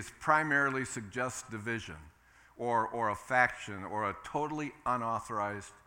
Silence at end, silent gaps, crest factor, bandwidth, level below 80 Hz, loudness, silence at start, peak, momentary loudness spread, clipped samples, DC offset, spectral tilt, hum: 0.1 s; none; 22 dB; 17.5 kHz; -64 dBFS; -33 LUFS; 0 s; -12 dBFS; 11 LU; under 0.1%; under 0.1%; -4.5 dB/octave; none